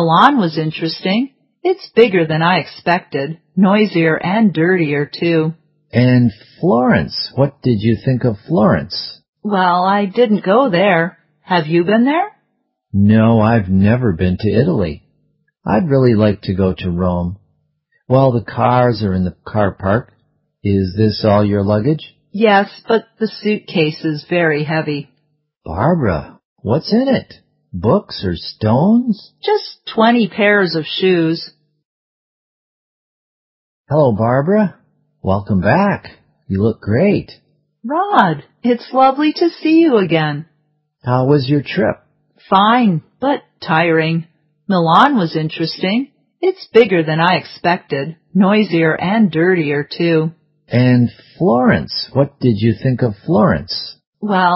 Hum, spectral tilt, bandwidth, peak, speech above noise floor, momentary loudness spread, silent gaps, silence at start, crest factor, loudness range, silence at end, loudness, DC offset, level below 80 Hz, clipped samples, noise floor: none; -9.5 dB/octave; 5.8 kHz; 0 dBFS; 54 dB; 10 LU; 9.28-9.33 s, 25.57-25.61 s, 26.45-26.56 s, 31.85-33.84 s, 54.07-54.13 s; 0 s; 14 dB; 4 LU; 0 s; -15 LUFS; under 0.1%; -40 dBFS; under 0.1%; -68 dBFS